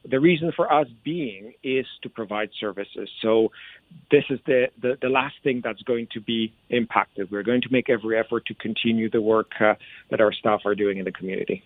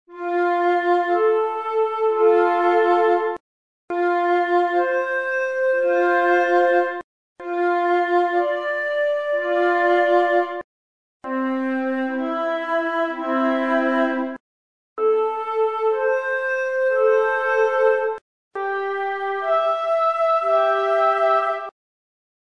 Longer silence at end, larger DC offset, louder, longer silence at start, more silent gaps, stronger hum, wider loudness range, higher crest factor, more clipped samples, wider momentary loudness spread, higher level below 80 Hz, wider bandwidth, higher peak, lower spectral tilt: second, 0.05 s vs 0.75 s; second, under 0.1% vs 0.2%; second, -24 LUFS vs -20 LUFS; about the same, 0.05 s vs 0.1 s; second, none vs 3.40-3.88 s, 7.04-7.36 s, 10.64-11.20 s, 14.40-14.96 s, 18.21-18.51 s; neither; about the same, 3 LU vs 3 LU; first, 22 dB vs 14 dB; neither; about the same, 9 LU vs 9 LU; first, -64 dBFS vs -72 dBFS; second, 4.4 kHz vs 9.2 kHz; first, -2 dBFS vs -6 dBFS; first, -9 dB/octave vs -4 dB/octave